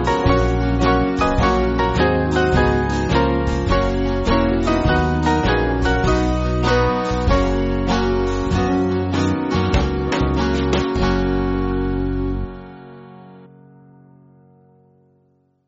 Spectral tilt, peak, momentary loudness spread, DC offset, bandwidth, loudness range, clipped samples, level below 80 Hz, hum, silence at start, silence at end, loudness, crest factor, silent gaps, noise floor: -5.5 dB/octave; -2 dBFS; 4 LU; under 0.1%; 8 kHz; 7 LU; under 0.1%; -26 dBFS; none; 0 s; 2.2 s; -18 LUFS; 16 dB; none; -60 dBFS